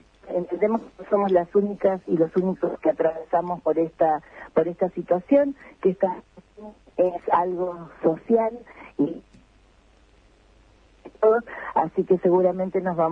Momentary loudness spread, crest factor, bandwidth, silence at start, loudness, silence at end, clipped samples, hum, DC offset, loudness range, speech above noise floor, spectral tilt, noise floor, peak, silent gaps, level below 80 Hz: 9 LU; 18 dB; 5.6 kHz; 0.25 s; -24 LUFS; 0 s; under 0.1%; none; under 0.1%; 5 LU; 34 dB; -9.5 dB/octave; -56 dBFS; -6 dBFS; none; -60 dBFS